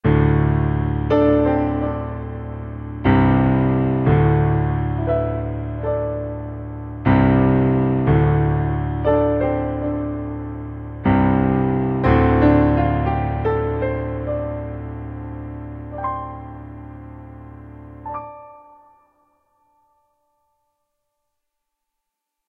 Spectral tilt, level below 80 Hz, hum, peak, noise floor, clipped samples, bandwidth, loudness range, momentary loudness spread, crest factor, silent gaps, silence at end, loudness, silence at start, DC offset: -11.5 dB/octave; -32 dBFS; none; -4 dBFS; -80 dBFS; under 0.1%; 4.8 kHz; 19 LU; 17 LU; 16 dB; none; 3.9 s; -19 LUFS; 0.05 s; under 0.1%